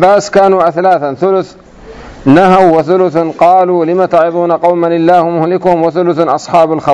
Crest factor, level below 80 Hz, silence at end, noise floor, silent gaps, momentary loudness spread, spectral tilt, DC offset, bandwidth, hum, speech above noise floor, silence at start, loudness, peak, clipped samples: 8 dB; -44 dBFS; 0 s; -31 dBFS; none; 5 LU; -7 dB/octave; under 0.1%; 11 kHz; none; 22 dB; 0 s; -9 LUFS; 0 dBFS; 3%